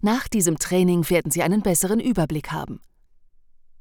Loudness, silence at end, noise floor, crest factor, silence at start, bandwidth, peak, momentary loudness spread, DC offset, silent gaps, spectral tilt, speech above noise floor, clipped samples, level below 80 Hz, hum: -21 LUFS; 1.05 s; -53 dBFS; 16 dB; 0 s; over 20 kHz; -6 dBFS; 11 LU; under 0.1%; none; -5 dB/octave; 32 dB; under 0.1%; -44 dBFS; none